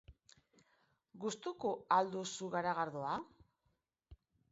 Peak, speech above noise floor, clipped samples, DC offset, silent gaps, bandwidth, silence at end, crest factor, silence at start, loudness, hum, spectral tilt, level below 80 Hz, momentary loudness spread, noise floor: -18 dBFS; 45 dB; under 0.1%; under 0.1%; none; 7.6 kHz; 0.4 s; 24 dB; 0.1 s; -39 LUFS; none; -3.5 dB/octave; -72 dBFS; 10 LU; -83 dBFS